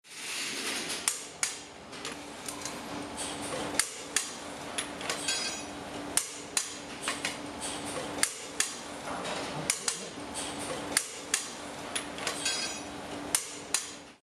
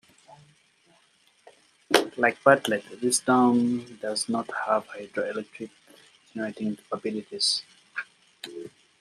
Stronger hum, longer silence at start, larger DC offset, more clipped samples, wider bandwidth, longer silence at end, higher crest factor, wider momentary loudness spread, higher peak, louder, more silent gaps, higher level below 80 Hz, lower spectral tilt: neither; second, 0.05 s vs 1.9 s; neither; neither; first, 16 kHz vs 14 kHz; second, 0.1 s vs 0.3 s; about the same, 28 dB vs 26 dB; second, 9 LU vs 21 LU; second, -8 dBFS vs -2 dBFS; second, -33 LUFS vs -26 LUFS; neither; first, -64 dBFS vs -76 dBFS; second, -1 dB/octave vs -3 dB/octave